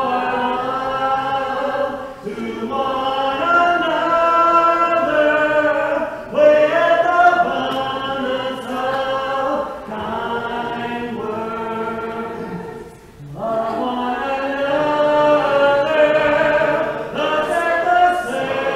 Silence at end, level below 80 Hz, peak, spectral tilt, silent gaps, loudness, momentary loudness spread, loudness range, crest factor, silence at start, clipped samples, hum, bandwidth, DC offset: 0 s; -50 dBFS; -2 dBFS; -5 dB/octave; none; -18 LUFS; 11 LU; 9 LU; 14 dB; 0 s; under 0.1%; none; 13.5 kHz; under 0.1%